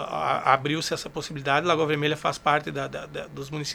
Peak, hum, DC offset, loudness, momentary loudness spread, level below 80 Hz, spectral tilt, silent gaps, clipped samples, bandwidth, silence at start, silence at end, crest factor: -4 dBFS; none; under 0.1%; -25 LUFS; 12 LU; -56 dBFS; -4.5 dB/octave; none; under 0.1%; 19.5 kHz; 0 s; 0 s; 22 dB